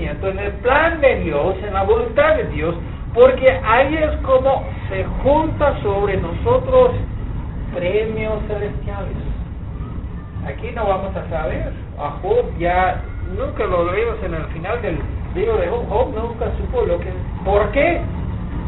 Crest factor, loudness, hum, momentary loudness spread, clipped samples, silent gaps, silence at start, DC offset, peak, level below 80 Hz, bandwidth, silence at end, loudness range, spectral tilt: 18 dB; -19 LUFS; none; 12 LU; under 0.1%; none; 0 s; 0.3%; 0 dBFS; -28 dBFS; 4.1 kHz; 0 s; 8 LU; -5.5 dB/octave